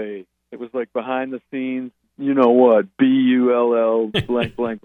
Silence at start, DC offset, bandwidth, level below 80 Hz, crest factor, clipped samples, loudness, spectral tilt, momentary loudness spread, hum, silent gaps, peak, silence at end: 0 s; under 0.1%; 4.3 kHz; -54 dBFS; 16 dB; under 0.1%; -18 LUFS; -8 dB/octave; 15 LU; none; none; -2 dBFS; 0.05 s